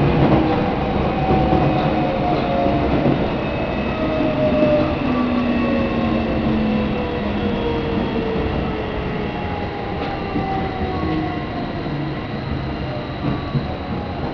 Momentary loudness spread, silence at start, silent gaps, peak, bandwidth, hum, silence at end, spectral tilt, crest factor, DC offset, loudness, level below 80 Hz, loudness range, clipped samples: 8 LU; 0 s; none; -4 dBFS; 5.4 kHz; none; 0 s; -9 dB/octave; 16 dB; under 0.1%; -20 LUFS; -32 dBFS; 5 LU; under 0.1%